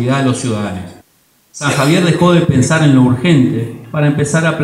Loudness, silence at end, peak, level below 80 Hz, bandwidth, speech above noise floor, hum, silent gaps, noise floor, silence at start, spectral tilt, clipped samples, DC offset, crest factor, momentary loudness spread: -12 LUFS; 0 s; 0 dBFS; -44 dBFS; 15 kHz; 42 dB; none; none; -54 dBFS; 0 s; -6 dB/octave; under 0.1%; under 0.1%; 12 dB; 11 LU